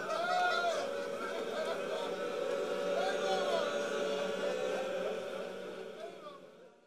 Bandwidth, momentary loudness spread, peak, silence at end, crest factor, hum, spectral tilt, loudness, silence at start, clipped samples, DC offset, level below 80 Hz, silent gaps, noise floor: 15.5 kHz; 13 LU; -20 dBFS; 0 s; 16 dB; none; -3 dB/octave; -36 LUFS; 0 s; under 0.1%; under 0.1%; -84 dBFS; none; -56 dBFS